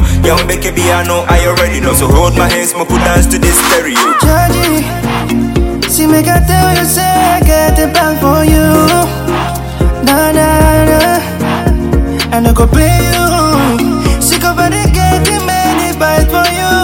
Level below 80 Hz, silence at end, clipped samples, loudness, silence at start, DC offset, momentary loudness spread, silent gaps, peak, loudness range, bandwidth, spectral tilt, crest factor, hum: -16 dBFS; 0 s; 0.7%; -9 LUFS; 0 s; 0.5%; 5 LU; none; 0 dBFS; 1 LU; 17.5 kHz; -4.5 dB/octave; 8 dB; none